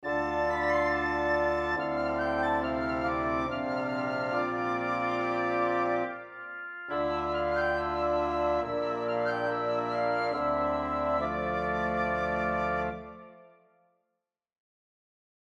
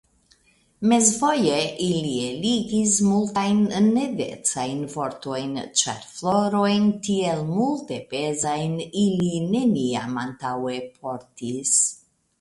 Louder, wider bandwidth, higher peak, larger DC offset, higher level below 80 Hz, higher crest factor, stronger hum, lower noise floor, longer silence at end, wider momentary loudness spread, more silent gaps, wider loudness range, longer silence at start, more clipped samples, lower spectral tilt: second, -30 LUFS vs -23 LUFS; second, 8.2 kHz vs 11.5 kHz; second, -16 dBFS vs -2 dBFS; neither; first, -52 dBFS vs -60 dBFS; second, 14 dB vs 20 dB; neither; first, -84 dBFS vs -61 dBFS; first, 2 s vs 0.45 s; second, 4 LU vs 11 LU; neither; about the same, 3 LU vs 4 LU; second, 0 s vs 0.8 s; neither; first, -6.5 dB/octave vs -4 dB/octave